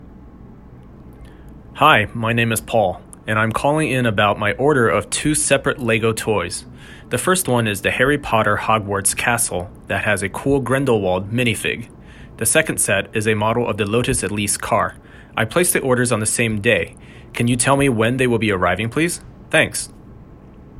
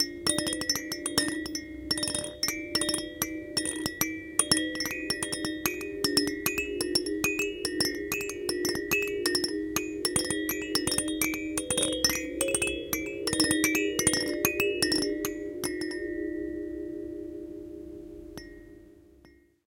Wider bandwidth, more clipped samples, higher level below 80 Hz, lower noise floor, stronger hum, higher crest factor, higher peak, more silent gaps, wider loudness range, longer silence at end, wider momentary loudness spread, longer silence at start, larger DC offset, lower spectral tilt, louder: about the same, 16 kHz vs 17 kHz; neither; first, -44 dBFS vs -54 dBFS; second, -41 dBFS vs -59 dBFS; neither; second, 18 dB vs 26 dB; first, 0 dBFS vs -6 dBFS; neither; second, 2 LU vs 7 LU; second, 0 s vs 0.4 s; second, 8 LU vs 12 LU; about the same, 0 s vs 0 s; neither; first, -4 dB/octave vs -2 dB/octave; first, -18 LUFS vs -28 LUFS